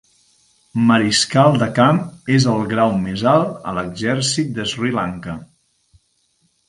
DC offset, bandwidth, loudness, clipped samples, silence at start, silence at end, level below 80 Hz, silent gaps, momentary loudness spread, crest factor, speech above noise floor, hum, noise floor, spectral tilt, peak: under 0.1%; 11.5 kHz; -17 LUFS; under 0.1%; 0.75 s; 1.25 s; -50 dBFS; none; 11 LU; 18 dB; 47 dB; none; -63 dBFS; -5 dB/octave; 0 dBFS